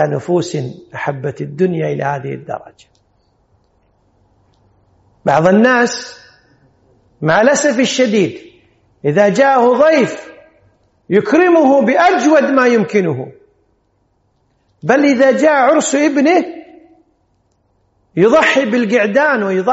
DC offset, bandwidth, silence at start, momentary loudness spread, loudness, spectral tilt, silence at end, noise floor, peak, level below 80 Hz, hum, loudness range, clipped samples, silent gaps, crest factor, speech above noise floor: under 0.1%; 8 kHz; 0 s; 14 LU; -13 LUFS; -4.5 dB/octave; 0 s; -60 dBFS; 0 dBFS; -58 dBFS; none; 9 LU; under 0.1%; none; 14 dB; 48 dB